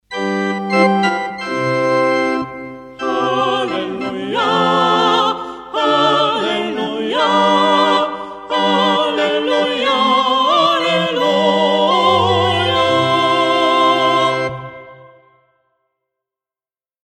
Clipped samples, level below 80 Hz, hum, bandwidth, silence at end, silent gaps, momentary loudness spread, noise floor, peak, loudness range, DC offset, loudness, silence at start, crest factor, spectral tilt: under 0.1%; -56 dBFS; none; 15 kHz; 2.1 s; none; 9 LU; under -90 dBFS; -2 dBFS; 4 LU; under 0.1%; -15 LUFS; 0.1 s; 14 dB; -4.5 dB/octave